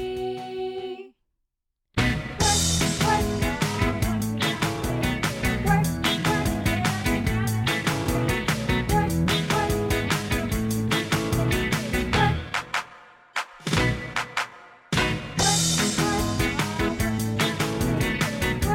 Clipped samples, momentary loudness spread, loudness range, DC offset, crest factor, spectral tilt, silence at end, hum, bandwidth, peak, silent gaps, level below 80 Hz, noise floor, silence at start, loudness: under 0.1%; 8 LU; 2 LU; under 0.1%; 16 dB; -4 dB/octave; 0 s; none; 17.5 kHz; -8 dBFS; none; -36 dBFS; -80 dBFS; 0 s; -24 LUFS